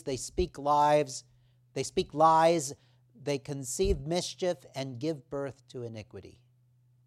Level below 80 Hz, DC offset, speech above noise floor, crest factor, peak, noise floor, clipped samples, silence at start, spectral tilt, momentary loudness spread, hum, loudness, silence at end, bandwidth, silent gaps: -48 dBFS; under 0.1%; 36 dB; 20 dB; -12 dBFS; -65 dBFS; under 0.1%; 0.05 s; -4.5 dB/octave; 18 LU; none; -29 LUFS; 0.75 s; 15 kHz; none